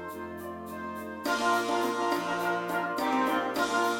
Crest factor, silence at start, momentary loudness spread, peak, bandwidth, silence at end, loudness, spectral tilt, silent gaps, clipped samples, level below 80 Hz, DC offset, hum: 16 dB; 0 s; 12 LU; -14 dBFS; 18.5 kHz; 0 s; -30 LUFS; -3.5 dB/octave; none; under 0.1%; -68 dBFS; under 0.1%; none